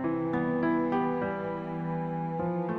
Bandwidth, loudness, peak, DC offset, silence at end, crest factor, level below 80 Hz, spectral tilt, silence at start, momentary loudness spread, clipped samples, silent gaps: 5 kHz; -30 LUFS; -16 dBFS; under 0.1%; 0 s; 14 dB; -60 dBFS; -10 dB/octave; 0 s; 6 LU; under 0.1%; none